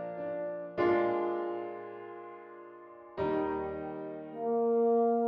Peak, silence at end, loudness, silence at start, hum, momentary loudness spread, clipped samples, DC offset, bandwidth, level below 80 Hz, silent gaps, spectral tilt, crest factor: -18 dBFS; 0 s; -32 LUFS; 0 s; none; 20 LU; under 0.1%; under 0.1%; 5.4 kHz; -66 dBFS; none; -9 dB/octave; 14 dB